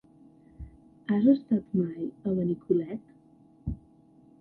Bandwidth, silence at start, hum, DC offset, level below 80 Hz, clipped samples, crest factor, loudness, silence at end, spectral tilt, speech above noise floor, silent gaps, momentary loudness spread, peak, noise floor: 4.3 kHz; 0.6 s; none; under 0.1%; -52 dBFS; under 0.1%; 20 dB; -28 LUFS; 0.65 s; -11.5 dB/octave; 31 dB; none; 25 LU; -10 dBFS; -58 dBFS